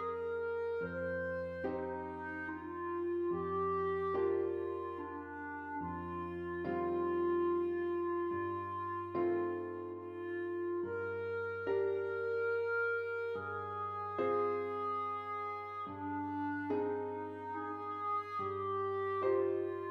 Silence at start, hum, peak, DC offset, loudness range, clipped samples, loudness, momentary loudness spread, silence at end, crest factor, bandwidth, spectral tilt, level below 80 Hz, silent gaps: 0 s; none; -22 dBFS; under 0.1%; 3 LU; under 0.1%; -38 LUFS; 8 LU; 0 s; 14 dB; 5.4 kHz; -9 dB/octave; -70 dBFS; none